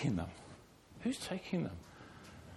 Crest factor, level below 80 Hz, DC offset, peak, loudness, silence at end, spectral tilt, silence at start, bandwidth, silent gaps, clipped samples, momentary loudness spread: 18 dB; -62 dBFS; under 0.1%; -22 dBFS; -41 LUFS; 0 s; -6 dB/octave; 0 s; 13.5 kHz; none; under 0.1%; 18 LU